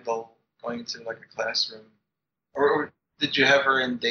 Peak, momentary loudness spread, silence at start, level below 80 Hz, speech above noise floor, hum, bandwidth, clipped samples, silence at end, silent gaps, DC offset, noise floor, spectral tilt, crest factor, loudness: -8 dBFS; 17 LU; 0.05 s; -70 dBFS; 60 dB; none; 7 kHz; under 0.1%; 0 s; none; under 0.1%; -85 dBFS; -3 dB/octave; 18 dB; -24 LUFS